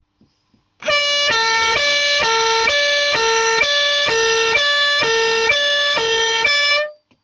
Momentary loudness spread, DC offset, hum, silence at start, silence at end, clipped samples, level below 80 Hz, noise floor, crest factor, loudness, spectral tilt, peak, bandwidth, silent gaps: 2 LU; under 0.1%; none; 0.8 s; 0.3 s; under 0.1%; -52 dBFS; -62 dBFS; 12 dB; -14 LUFS; 0.5 dB/octave; -4 dBFS; 10 kHz; none